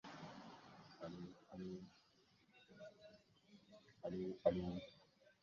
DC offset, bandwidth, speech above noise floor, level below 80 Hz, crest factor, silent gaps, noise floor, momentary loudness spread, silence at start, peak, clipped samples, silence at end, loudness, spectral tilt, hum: under 0.1%; 7.2 kHz; 28 dB; -72 dBFS; 28 dB; none; -75 dBFS; 26 LU; 0.05 s; -22 dBFS; under 0.1%; 0.1 s; -48 LUFS; -6.5 dB/octave; none